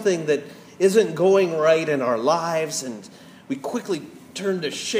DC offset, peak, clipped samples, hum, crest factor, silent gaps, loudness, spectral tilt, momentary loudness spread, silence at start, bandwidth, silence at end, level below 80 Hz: under 0.1%; -6 dBFS; under 0.1%; none; 16 dB; none; -22 LUFS; -4.5 dB/octave; 14 LU; 0 s; 15.5 kHz; 0 s; -74 dBFS